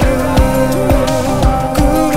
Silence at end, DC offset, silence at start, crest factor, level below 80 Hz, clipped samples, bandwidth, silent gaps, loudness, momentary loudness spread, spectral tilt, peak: 0 s; 5%; 0 s; 12 dB; -18 dBFS; under 0.1%; 16.5 kHz; none; -13 LUFS; 1 LU; -6 dB/octave; 0 dBFS